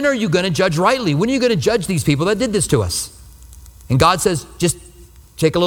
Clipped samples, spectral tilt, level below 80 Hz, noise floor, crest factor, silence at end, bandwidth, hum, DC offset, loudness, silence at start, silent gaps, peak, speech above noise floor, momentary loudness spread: under 0.1%; -5 dB/octave; -40 dBFS; -43 dBFS; 16 dB; 0 s; 18.5 kHz; none; under 0.1%; -17 LUFS; 0 s; none; 0 dBFS; 27 dB; 6 LU